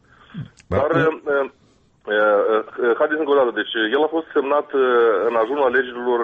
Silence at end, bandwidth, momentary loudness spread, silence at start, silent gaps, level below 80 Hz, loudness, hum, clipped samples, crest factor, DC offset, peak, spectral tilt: 0 s; 6.4 kHz; 10 LU; 0.35 s; none; -54 dBFS; -19 LUFS; none; under 0.1%; 12 dB; under 0.1%; -6 dBFS; -7 dB/octave